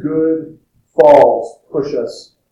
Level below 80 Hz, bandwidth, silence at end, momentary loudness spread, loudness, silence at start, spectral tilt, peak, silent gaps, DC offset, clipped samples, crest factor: -54 dBFS; 10 kHz; 0.3 s; 15 LU; -13 LUFS; 0 s; -7 dB/octave; 0 dBFS; none; under 0.1%; 0.9%; 14 dB